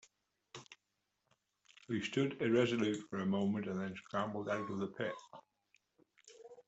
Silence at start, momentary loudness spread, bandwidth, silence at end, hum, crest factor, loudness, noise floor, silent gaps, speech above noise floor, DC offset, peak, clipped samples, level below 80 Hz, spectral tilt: 0.55 s; 22 LU; 8.2 kHz; 0.05 s; none; 22 dB; -37 LUFS; -86 dBFS; none; 49 dB; under 0.1%; -18 dBFS; under 0.1%; -78 dBFS; -6 dB/octave